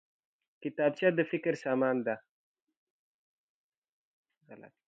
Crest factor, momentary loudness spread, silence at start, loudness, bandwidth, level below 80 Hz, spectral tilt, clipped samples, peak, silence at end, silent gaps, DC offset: 22 dB; 12 LU; 0.6 s; -31 LUFS; 7.8 kHz; -86 dBFS; -7 dB/octave; under 0.1%; -14 dBFS; 0.2 s; 2.29-2.55 s, 2.62-2.67 s, 2.77-3.82 s, 3.89-4.24 s, 4.37-4.41 s; under 0.1%